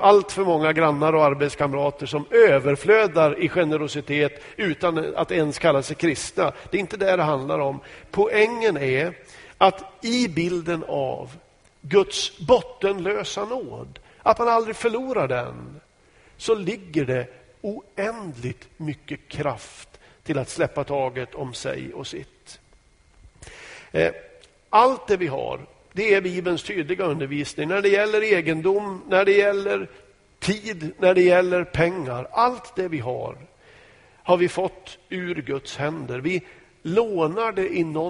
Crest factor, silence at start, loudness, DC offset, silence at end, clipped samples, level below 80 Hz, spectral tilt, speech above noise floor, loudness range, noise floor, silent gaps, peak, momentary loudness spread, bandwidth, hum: 20 dB; 0 s; -22 LUFS; under 0.1%; 0 s; under 0.1%; -54 dBFS; -5.5 dB/octave; 34 dB; 9 LU; -56 dBFS; none; -2 dBFS; 16 LU; 10.5 kHz; none